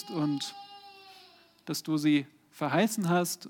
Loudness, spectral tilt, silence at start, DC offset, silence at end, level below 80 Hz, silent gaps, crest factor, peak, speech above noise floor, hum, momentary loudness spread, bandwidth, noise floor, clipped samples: -30 LUFS; -5 dB/octave; 0 s; under 0.1%; 0 s; -84 dBFS; none; 16 dB; -14 dBFS; 28 dB; none; 22 LU; 18.5 kHz; -58 dBFS; under 0.1%